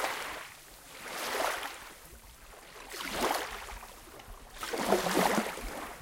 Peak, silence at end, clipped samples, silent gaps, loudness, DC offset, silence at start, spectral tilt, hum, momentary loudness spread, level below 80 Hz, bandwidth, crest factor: -10 dBFS; 0 s; under 0.1%; none; -33 LUFS; under 0.1%; 0 s; -3 dB/octave; none; 21 LU; -54 dBFS; 17 kHz; 26 dB